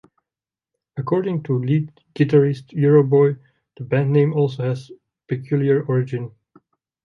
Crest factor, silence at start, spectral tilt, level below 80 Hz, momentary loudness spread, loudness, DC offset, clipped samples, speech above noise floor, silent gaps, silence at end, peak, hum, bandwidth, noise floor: 18 dB; 0.95 s; -10 dB/octave; -64 dBFS; 15 LU; -19 LUFS; under 0.1%; under 0.1%; 71 dB; none; 0.75 s; -4 dBFS; none; 6.4 kHz; -90 dBFS